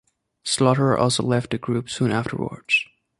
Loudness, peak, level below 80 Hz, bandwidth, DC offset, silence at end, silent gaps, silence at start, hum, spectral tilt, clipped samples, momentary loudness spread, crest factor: -22 LUFS; -2 dBFS; -54 dBFS; 11.5 kHz; under 0.1%; 0.35 s; none; 0.45 s; none; -5 dB/octave; under 0.1%; 9 LU; 20 dB